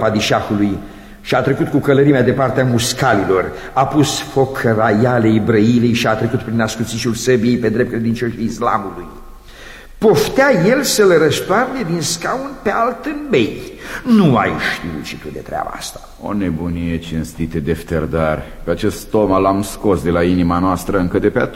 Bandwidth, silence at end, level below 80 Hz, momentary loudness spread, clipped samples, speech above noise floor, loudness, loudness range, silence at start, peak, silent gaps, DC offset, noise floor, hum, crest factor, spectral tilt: 16.5 kHz; 0 s; -36 dBFS; 12 LU; under 0.1%; 20 dB; -16 LUFS; 6 LU; 0 s; 0 dBFS; none; under 0.1%; -36 dBFS; none; 14 dB; -5.5 dB/octave